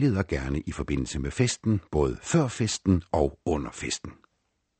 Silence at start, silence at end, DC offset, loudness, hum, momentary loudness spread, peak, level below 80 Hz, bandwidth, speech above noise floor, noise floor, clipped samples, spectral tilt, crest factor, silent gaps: 0 s; 0.7 s; under 0.1%; -28 LUFS; none; 7 LU; -8 dBFS; -40 dBFS; 8.8 kHz; 49 dB; -76 dBFS; under 0.1%; -5.5 dB/octave; 18 dB; none